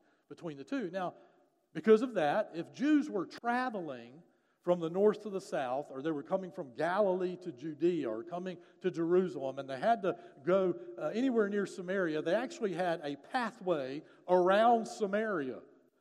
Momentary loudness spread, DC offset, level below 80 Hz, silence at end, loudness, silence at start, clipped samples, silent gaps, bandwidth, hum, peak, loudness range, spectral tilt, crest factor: 14 LU; under 0.1%; under -90 dBFS; 0.4 s; -33 LUFS; 0.3 s; under 0.1%; none; 11.5 kHz; none; -14 dBFS; 3 LU; -6.5 dB/octave; 18 dB